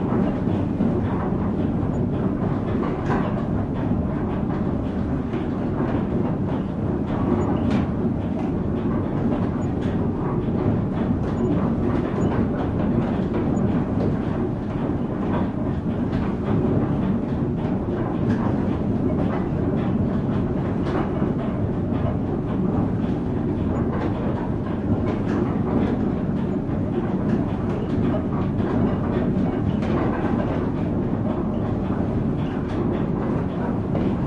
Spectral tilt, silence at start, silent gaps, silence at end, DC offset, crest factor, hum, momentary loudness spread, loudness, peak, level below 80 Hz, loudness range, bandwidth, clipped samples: -10 dB/octave; 0 s; none; 0 s; under 0.1%; 14 dB; none; 3 LU; -23 LUFS; -8 dBFS; -36 dBFS; 1 LU; 7.4 kHz; under 0.1%